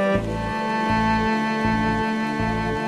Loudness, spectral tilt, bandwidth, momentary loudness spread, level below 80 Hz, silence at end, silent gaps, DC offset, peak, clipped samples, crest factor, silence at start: -22 LUFS; -6.5 dB/octave; 11.5 kHz; 4 LU; -38 dBFS; 0 s; none; under 0.1%; -10 dBFS; under 0.1%; 12 dB; 0 s